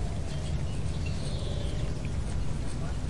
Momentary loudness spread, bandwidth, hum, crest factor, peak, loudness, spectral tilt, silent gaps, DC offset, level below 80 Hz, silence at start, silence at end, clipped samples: 1 LU; 11.5 kHz; none; 12 dB; -18 dBFS; -34 LUFS; -6 dB/octave; none; 2%; -36 dBFS; 0 s; 0 s; under 0.1%